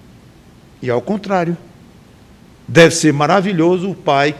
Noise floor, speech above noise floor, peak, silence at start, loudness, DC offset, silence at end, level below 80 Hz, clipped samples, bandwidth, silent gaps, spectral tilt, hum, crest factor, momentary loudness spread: -44 dBFS; 30 dB; 0 dBFS; 0.8 s; -14 LUFS; under 0.1%; 0 s; -52 dBFS; under 0.1%; 14 kHz; none; -5 dB/octave; none; 16 dB; 11 LU